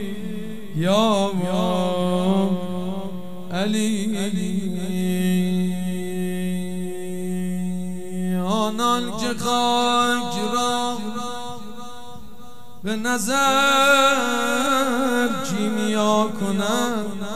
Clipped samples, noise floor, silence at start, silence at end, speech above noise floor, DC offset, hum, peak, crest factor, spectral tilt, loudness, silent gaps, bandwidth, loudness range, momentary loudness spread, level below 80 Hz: under 0.1%; -45 dBFS; 0 s; 0 s; 24 dB; 3%; none; -6 dBFS; 16 dB; -4.5 dB/octave; -22 LUFS; none; 16 kHz; 6 LU; 12 LU; -58 dBFS